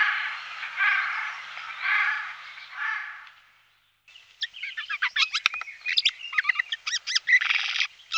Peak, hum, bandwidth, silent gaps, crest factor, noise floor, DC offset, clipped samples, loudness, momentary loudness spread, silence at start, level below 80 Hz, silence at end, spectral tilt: -2 dBFS; none; 14 kHz; none; 26 dB; -64 dBFS; under 0.1%; under 0.1%; -25 LUFS; 13 LU; 0 s; -80 dBFS; 0 s; 5 dB/octave